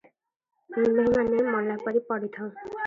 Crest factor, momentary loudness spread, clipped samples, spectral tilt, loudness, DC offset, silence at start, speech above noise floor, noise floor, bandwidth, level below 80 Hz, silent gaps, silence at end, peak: 14 dB; 13 LU; under 0.1%; -8 dB/octave; -26 LUFS; under 0.1%; 0.7 s; 38 dB; -63 dBFS; 7.2 kHz; -58 dBFS; none; 0 s; -12 dBFS